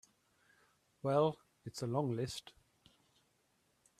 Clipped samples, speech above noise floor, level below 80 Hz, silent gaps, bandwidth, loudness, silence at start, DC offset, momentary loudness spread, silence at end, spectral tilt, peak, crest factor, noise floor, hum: under 0.1%; 41 dB; -74 dBFS; none; 14 kHz; -37 LUFS; 1.05 s; under 0.1%; 15 LU; 1.5 s; -6.5 dB/octave; -18 dBFS; 22 dB; -77 dBFS; none